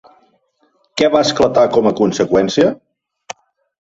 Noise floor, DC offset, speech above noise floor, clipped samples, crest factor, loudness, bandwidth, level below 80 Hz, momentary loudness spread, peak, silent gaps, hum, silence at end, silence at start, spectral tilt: -60 dBFS; under 0.1%; 47 dB; under 0.1%; 16 dB; -14 LUFS; 8 kHz; -50 dBFS; 21 LU; -2 dBFS; none; none; 0.55 s; 0.95 s; -5 dB/octave